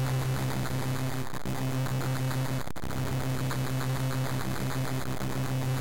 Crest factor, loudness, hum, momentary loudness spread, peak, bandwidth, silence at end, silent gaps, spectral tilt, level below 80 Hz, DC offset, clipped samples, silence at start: 8 dB; -32 LUFS; none; 3 LU; -24 dBFS; 17 kHz; 0 s; none; -5.5 dB/octave; -46 dBFS; 2%; under 0.1%; 0 s